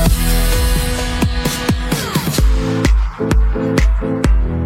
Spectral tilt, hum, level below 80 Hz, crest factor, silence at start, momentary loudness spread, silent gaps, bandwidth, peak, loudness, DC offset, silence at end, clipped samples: -5 dB/octave; none; -16 dBFS; 14 dB; 0 s; 2 LU; none; 16.5 kHz; 0 dBFS; -16 LUFS; under 0.1%; 0 s; under 0.1%